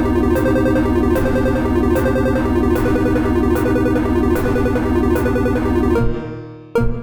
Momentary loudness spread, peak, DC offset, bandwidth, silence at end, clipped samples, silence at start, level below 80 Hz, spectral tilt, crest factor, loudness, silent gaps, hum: 4 LU; -4 dBFS; 2%; over 20 kHz; 0 s; under 0.1%; 0 s; -24 dBFS; -8 dB/octave; 12 dB; -17 LUFS; none; none